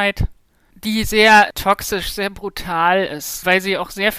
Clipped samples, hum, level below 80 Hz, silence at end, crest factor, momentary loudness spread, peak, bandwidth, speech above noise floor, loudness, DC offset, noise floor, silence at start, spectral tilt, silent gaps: under 0.1%; none; -34 dBFS; 0 s; 16 dB; 15 LU; -2 dBFS; 16 kHz; 34 dB; -16 LUFS; under 0.1%; -51 dBFS; 0 s; -3.5 dB/octave; none